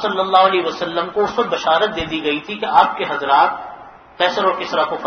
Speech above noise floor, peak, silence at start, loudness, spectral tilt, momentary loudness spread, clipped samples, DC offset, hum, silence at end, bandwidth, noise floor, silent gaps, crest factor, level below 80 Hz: 21 dB; 0 dBFS; 0 s; -17 LUFS; -4 dB/octave; 8 LU; under 0.1%; under 0.1%; none; 0 s; 6.6 kHz; -38 dBFS; none; 18 dB; -50 dBFS